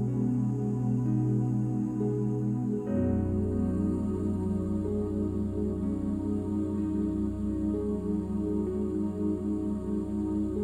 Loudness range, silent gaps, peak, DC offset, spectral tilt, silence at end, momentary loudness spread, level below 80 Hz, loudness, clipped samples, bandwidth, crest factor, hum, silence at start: 2 LU; none; -18 dBFS; under 0.1%; -10.5 dB/octave; 0 s; 3 LU; -46 dBFS; -30 LUFS; under 0.1%; 10 kHz; 12 dB; none; 0 s